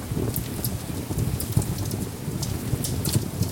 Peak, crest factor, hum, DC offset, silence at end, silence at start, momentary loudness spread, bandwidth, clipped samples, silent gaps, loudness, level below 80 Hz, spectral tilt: -8 dBFS; 20 dB; none; under 0.1%; 0 s; 0 s; 5 LU; 19 kHz; under 0.1%; none; -27 LUFS; -40 dBFS; -5 dB/octave